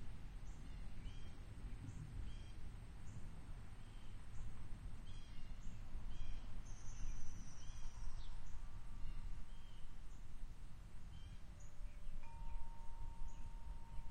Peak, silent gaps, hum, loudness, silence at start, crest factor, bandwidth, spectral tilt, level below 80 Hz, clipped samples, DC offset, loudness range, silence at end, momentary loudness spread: -30 dBFS; none; none; -57 LUFS; 0 s; 14 dB; 9 kHz; -5 dB/octave; -50 dBFS; under 0.1%; under 0.1%; 3 LU; 0 s; 5 LU